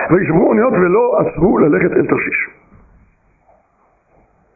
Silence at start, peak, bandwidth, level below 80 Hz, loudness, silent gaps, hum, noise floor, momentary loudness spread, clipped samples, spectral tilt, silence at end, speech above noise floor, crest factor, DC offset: 0 s; -2 dBFS; 2.7 kHz; -42 dBFS; -13 LUFS; none; none; -57 dBFS; 5 LU; under 0.1%; -15 dB/octave; 2.05 s; 44 dB; 12 dB; under 0.1%